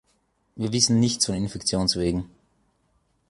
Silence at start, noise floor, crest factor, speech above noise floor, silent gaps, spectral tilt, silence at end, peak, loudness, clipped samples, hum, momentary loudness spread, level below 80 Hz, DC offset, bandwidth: 0.55 s; -68 dBFS; 22 dB; 45 dB; none; -4 dB/octave; 1.05 s; -4 dBFS; -23 LUFS; under 0.1%; none; 12 LU; -46 dBFS; under 0.1%; 11.5 kHz